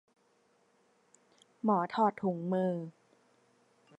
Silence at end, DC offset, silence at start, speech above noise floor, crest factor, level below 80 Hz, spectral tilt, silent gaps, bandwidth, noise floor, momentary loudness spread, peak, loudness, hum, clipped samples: 1.1 s; under 0.1%; 1.65 s; 40 dB; 20 dB; -84 dBFS; -8.5 dB/octave; none; 8.6 kHz; -71 dBFS; 9 LU; -16 dBFS; -32 LUFS; none; under 0.1%